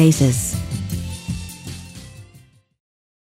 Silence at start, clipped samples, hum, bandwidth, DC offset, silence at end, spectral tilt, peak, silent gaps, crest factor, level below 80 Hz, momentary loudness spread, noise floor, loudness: 0 s; under 0.1%; none; 16 kHz; under 0.1%; 1 s; -5.5 dB/octave; -2 dBFS; none; 20 dB; -40 dBFS; 22 LU; -50 dBFS; -22 LUFS